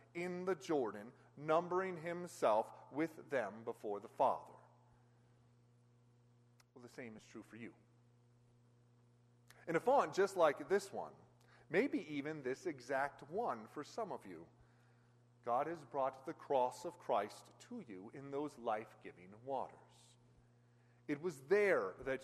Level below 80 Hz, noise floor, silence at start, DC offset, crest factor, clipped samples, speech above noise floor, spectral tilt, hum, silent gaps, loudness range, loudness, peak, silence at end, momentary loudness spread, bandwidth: -82 dBFS; -70 dBFS; 0.15 s; under 0.1%; 22 dB; under 0.1%; 30 dB; -5.5 dB/octave; 60 Hz at -70 dBFS; none; 20 LU; -40 LUFS; -20 dBFS; 0 s; 20 LU; 13 kHz